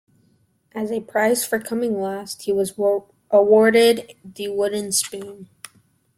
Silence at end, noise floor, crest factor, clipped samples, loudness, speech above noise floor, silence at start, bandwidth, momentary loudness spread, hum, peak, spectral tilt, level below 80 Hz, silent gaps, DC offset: 0.7 s; -62 dBFS; 18 dB; under 0.1%; -20 LUFS; 42 dB; 0.75 s; 16.5 kHz; 21 LU; none; -4 dBFS; -3 dB/octave; -64 dBFS; none; under 0.1%